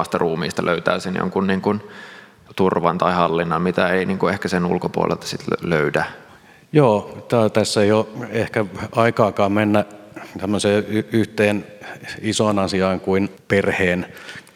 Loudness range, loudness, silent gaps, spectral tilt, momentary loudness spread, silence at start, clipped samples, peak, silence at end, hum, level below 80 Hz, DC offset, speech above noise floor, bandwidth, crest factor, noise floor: 2 LU; -20 LUFS; none; -5.5 dB/octave; 11 LU; 0 s; under 0.1%; 0 dBFS; 0.15 s; none; -48 dBFS; under 0.1%; 27 dB; 16 kHz; 20 dB; -47 dBFS